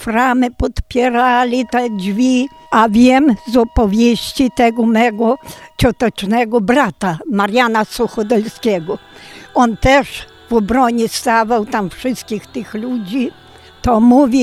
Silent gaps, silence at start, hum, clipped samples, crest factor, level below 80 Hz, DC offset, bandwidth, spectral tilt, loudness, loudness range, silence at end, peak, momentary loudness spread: none; 0 s; none; under 0.1%; 14 dB; -32 dBFS; under 0.1%; 14.5 kHz; -5.5 dB/octave; -14 LUFS; 4 LU; 0 s; 0 dBFS; 11 LU